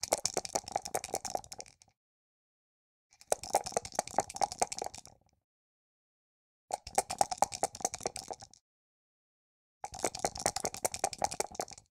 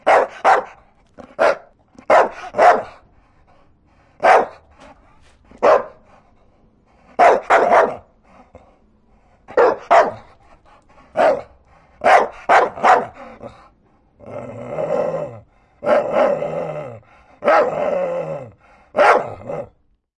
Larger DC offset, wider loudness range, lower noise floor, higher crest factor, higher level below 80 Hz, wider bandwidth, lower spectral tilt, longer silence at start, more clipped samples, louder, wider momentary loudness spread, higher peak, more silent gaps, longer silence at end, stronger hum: neither; second, 2 LU vs 5 LU; about the same, -55 dBFS vs -56 dBFS; first, 30 dB vs 18 dB; second, -64 dBFS vs -56 dBFS; first, 17 kHz vs 11 kHz; second, -1.5 dB/octave vs -4.5 dB/octave; about the same, 0 s vs 0.05 s; neither; second, -35 LUFS vs -16 LUFS; second, 14 LU vs 19 LU; second, -8 dBFS vs 0 dBFS; first, 1.97-3.10 s, 5.44-6.68 s, 8.61-9.81 s vs none; second, 0.15 s vs 0.55 s; neither